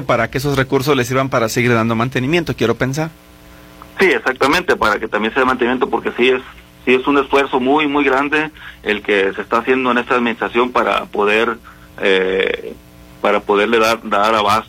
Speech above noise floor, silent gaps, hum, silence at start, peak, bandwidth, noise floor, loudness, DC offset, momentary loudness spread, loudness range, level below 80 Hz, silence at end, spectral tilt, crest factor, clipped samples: 25 dB; none; none; 0 s; -2 dBFS; 16.5 kHz; -41 dBFS; -16 LUFS; under 0.1%; 6 LU; 2 LU; -44 dBFS; 0.05 s; -5 dB/octave; 14 dB; under 0.1%